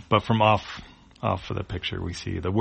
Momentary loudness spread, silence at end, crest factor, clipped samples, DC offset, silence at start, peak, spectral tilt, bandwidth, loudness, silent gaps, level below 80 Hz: 11 LU; 0 s; 22 dB; under 0.1%; under 0.1%; 0 s; -4 dBFS; -6.5 dB/octave; 8.4 kHz; -26 LUFS; none; -46 dBFS